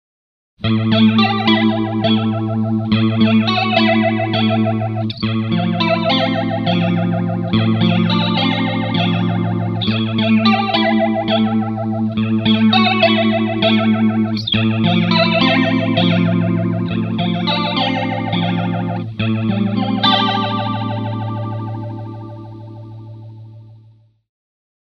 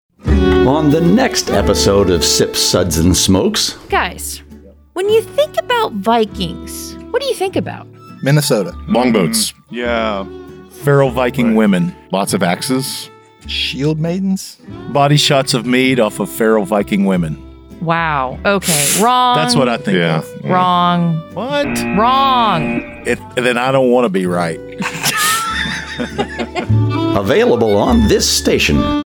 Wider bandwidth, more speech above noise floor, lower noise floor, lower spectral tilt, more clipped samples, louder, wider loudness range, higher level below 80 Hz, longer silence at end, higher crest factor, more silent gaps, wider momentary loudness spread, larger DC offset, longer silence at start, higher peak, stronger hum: second, 6.2 kHz vs over 20 kHz; first, 35 dB vs 25 dB; first, -48 dBFS vs -39 dBFS; first, -8 dB/octave vs -4.5 dB/octave; neither; about the same, -16 LUFS vs -14 LUFS; about the same, 5 LU vs 4 LU; second, -48 dBFS vs -30 dBFS; first, 1.15 s vs 0.05 s; about the same, 16 dB vs 12 dB; neither; about the same, 10 LU vs 10 LU; neither; first, 0.6 s vs 0.25 s; about the same, 0 dBFS vs -2 dBFS; neither